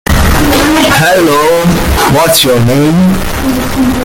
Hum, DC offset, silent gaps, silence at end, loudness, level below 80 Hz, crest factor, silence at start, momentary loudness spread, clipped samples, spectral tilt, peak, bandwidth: none; under 0.1%; none; 0 s; -8 LUFS; -18 dBFS; 8 dB; 0.05 s; 5 LU; under 0.1%; -4.5 dB/octave; 0 dBFS; 17.5 kHz